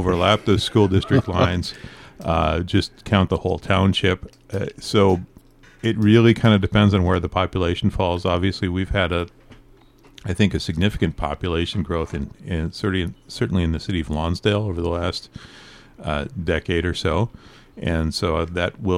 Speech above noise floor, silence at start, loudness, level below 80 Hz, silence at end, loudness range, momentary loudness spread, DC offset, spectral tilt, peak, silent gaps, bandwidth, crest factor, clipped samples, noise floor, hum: 30 dB; 0 s; -21 LUFS; -36 dBFS; 0 s; 6 LU; 12 LU; under 0.1%; -6.5 dB/octave; -2 dBFS; none; 12.5 kHz; 18 dB; under 0.1%; -50 dBFS; none